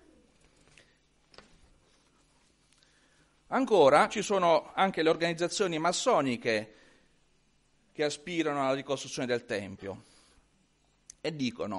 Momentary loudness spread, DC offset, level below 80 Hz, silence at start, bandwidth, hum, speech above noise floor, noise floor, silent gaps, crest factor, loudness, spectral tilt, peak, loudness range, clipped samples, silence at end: 15 LU; under 0.1%; -68 dBFS; 3.5 s; 11.5 kHz; none; 41 dB; -69 dBFS; none; 22 dB; -29 LUFS; -4 dB/octave; -8 dBFS; 8 LU; under 0.1%; 0 s